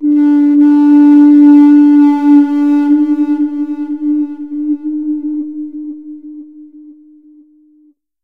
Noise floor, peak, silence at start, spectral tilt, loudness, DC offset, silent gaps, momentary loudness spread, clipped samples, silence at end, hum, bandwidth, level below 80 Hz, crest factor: -50 dBFS; 0 dBFS; 0 s; -7 dB/octave; -9 LUFS; 0.6%; none; 19 LU; under 0.1%; 1.3 s; none; 3.4 kHz; -64 dBFS; 10 dB